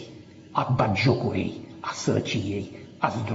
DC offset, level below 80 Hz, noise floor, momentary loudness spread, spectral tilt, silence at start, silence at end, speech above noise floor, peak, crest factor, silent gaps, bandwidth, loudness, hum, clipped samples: under 0.1%; -58 dBFS; -46 dBFS; 14 LU; -5.5 dB/octave; 0 s; 0 s; 20 dB; -6 dBFS; 20 dB; none; 8 kHz; -26 LUFS; none; under 0.1%